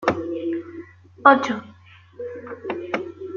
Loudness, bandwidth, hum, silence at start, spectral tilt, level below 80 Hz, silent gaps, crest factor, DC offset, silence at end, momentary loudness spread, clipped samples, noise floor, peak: -22 LUFS; 7.4 kHz; none; 0 s; -5.5 dB/octave; -64 dBFS; none; 22 dB; under 0.1%; 0 s; 20 LU; under 0.1%; -49 dBFS; -2 dBFS